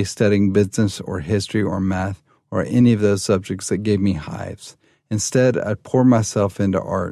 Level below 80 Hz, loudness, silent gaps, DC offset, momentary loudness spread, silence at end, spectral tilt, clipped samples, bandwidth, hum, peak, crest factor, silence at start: -42 dBFS; -19 LUFS; none; under 0.1%; 12 LU; 0 s; -6 dB/octave; under 0.1%; 13.5 kHz; none; -4 dBFS; 14 dB; 0 s